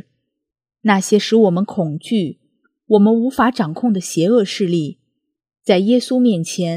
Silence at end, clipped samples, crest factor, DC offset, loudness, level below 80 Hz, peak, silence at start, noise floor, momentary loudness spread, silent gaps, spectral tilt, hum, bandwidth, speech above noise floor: 0 s; under 0.1%; 16 dB; under 0.1%; -16 LUFS; -60 dBFS; 0 dBFS; 0.85 s; -72 dBFS; 8 LU; none; -5.5 dB/octave; none; 15 kHz; 56 dB